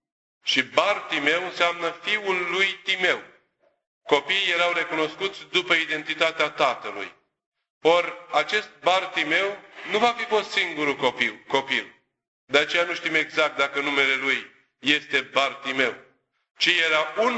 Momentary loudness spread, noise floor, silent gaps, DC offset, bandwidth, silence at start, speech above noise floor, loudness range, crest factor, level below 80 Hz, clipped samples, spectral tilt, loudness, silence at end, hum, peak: 6 LU; -67 dBFS; 3.87-4.01 s, 7.46-7.52 s, 7.70-7.81 s, 12.28-12.47 s, 16.51-16.55 s; under 0.1%; 8.4 kHz; 0.45 s; 43 dB; 2 LU; 22 dB; -70 dBFS; under 0.1%; -2.5 dB/octave; -23 LUFS; 0 s; none; -2 dBFS